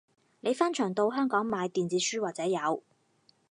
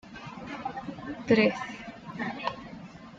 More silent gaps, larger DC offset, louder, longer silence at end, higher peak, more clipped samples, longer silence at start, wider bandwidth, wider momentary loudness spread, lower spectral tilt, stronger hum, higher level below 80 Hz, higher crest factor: neither; neither; about the same, -30 LUFS vs -30 LUFS; first, 0.75 s vs 0 s; about the same, -10 dBFS vs -10 dBFS; neither; first, 0.45 s vs 0.05 s; first, 11 kHz vs 7.6 kHz; second, 5 LU vs 19 LU; second, -4 dB/octave vs -6 dB/octave; neither; second, -78 dBFS vs -62 dBFS; about the same, 20 dB vs 20 dB